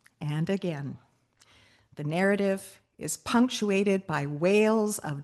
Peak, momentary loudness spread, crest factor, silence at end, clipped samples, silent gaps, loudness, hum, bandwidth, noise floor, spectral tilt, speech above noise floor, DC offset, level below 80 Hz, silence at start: -12 dBFS; 14 LU; 16 dB; 0 s; under 0.1%; none; -27 LUFS; none; 12.5 kHz; -63 dBFS; -5.5 dB/octave; 36 dB; under 0.1%; -68 dBFS; 0.2 s